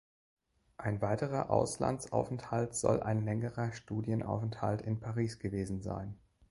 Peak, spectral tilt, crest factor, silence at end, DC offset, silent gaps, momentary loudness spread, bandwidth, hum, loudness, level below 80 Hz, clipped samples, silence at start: -14 dBFS; -6.5 dB/octave; 22 dB; 0.35 s; under 0.1%; none; 7 LU; 11.5 kHz; none; -35 LUFS; -58 dBFS; under 0.1%; 0.8 s